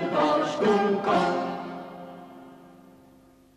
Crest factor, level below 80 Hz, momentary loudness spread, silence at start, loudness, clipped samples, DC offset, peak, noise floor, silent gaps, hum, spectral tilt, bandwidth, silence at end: 14 dB; -66 dBFS; 21 LU; 0 s; -24 LUFS; under 0.1%; under 0.1%; -12 dBFS; -55 dBFS; none; none; -6 dB/octave; 12 kHz; 0.9 s